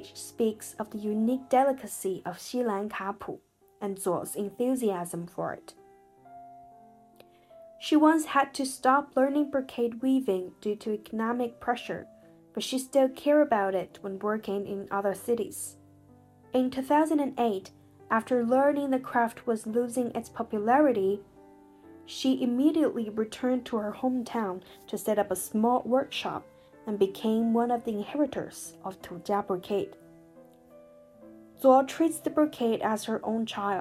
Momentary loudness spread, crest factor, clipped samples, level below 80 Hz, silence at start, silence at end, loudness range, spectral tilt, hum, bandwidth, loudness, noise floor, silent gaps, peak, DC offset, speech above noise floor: 13 LU; 22 dB; under 0.1%; -70 dBFS; 0 s; 0 s; 6 LU; -5 dB/octave; none; 15.5 kHz; -28 LUFS; -57 dBFS; none; -8 dBFS; under 0.1%; 29 dB